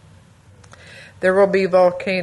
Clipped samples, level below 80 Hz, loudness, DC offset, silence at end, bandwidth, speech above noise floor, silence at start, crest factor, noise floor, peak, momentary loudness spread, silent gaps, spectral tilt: under 0.1%; -58 dBFS; -16 LUFS; under 0.1%; 0 s; 11 kHz; 32 dB; 0.9 s; 16 dB; -48 dBFS; -4 dBFS; 4 LU; none; -6.5 dB/octave